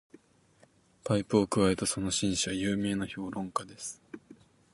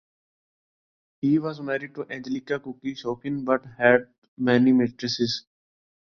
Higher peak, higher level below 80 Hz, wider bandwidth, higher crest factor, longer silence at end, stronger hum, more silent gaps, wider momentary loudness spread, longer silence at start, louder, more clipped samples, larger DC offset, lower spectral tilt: second, -12 dBFS vs -4 dBFS; first, -56 dBFS vs -64 dBFS; first, 11.5 kHz vs 6.8 kHz; about the same, 20 dB vs 22 dB; second, 0.4 s vs 0.65 s; neither; second, none vs 4.18-4.22 s, 4.28-4.37 s; first, 16 LU vs 12 LU; second, 1.05 s vs 1.25 s; second, -30 LUFS vs -25 LUFS; neither; neither; second, -4.5 dB/octave vs -6 dB/octave